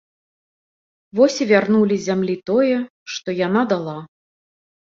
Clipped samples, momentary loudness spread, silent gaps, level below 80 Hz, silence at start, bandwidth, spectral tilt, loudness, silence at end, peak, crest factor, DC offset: under 0.1%; 13 LU; 2.90-3.06 s; -64 dBFS; 1.15 s; 7.6 kHz; -5.5 dB/octave; -19 LUFS; 0.8 s; -2 dBFS; 18 dB; under 0.1%